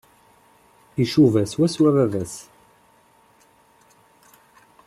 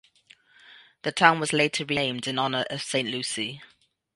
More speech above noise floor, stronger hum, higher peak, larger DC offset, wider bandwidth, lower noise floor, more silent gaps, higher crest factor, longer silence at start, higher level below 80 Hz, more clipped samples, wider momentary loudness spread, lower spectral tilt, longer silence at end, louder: first, 38 dB vs 33 dB; neither; second, -4 dBFS vs 0 dBFS; neither; first, 13.5 kHz vs 11.5 kHz; about the same, -57 dBFS vs -58 dBFS; neither; second, 20 dB vs 26 dB; first, 0.95 s vs 0.7 s; first, -60 dBFS vs -68 dBFS; neither; first, 16 LU vs 12 LU; first, -7 dB/octave vs -3 dB/octave; first, 2.45 s vs 0.5 s; first, -20 LUFS vs -25 LUFS